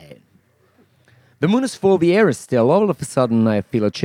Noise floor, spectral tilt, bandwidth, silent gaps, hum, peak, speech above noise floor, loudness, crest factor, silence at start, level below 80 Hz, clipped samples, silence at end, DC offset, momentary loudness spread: -57 dBFS; -6.5 dB/octave; 14.5 kHz; none; none; -2 dBFS; 41 dB; -17 LUFS; 16 dB; 0.1 s; -62 dBFS; under 0.1%; 0 s; under 0.1%; 5 LU